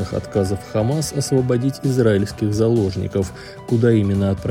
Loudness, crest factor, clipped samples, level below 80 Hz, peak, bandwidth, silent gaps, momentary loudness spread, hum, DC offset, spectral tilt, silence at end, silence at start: -19 LUFS; 16 dB; under 0.1%; -44 dBFS; -2 dBFS; 16 kHz; none; 6 LU; none; under 0.1%; -7 dB/octave; 0 s; 0 s